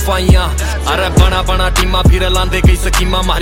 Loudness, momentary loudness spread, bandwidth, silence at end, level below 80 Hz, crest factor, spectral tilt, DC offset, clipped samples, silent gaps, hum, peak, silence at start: -12 LUFS; 4 LU; 16.5 kHz; 0 s; -14 dBFS; 10 dB; -4.5 dB/octave; under 0.1%; under 0.1%; none; none; 0 dBFS; 0 s